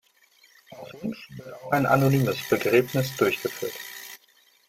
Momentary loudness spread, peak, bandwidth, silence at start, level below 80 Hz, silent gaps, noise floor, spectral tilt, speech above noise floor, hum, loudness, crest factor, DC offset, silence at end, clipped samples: 20 LU; -6 dBFS; 16.5 kHz; 0.7 s; -62 dBFS; none; -61 dBFS; -6 dB/octave; 36 dB; none; -24 LUFS; 20 dB; under 0.1%; 0.5 s; under 0.1%